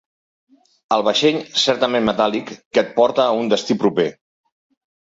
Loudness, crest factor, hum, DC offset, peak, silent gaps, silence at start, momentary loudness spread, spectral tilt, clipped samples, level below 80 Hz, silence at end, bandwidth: -18 LUFS; 18 dB; none; under 0.1%; -2 dBFS; 2.65-2.71 s; 0.9 s; 5 LU; -4 dB/octave; under 0.1%; -58 dBFS; 0.9 s; 8 kHz